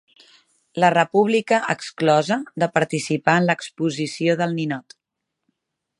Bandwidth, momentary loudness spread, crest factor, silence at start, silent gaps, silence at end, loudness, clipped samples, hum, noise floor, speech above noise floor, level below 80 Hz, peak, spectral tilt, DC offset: 11.5 kHz; 8 LU; 20 dB; 0.75 s; none; 1.2 s; -20 LUFS; under 0.1%; none; -81 dBFS; 61 dB; -68 dBFS; 0 dBFS; -5.5 dB/octave; under 0.1%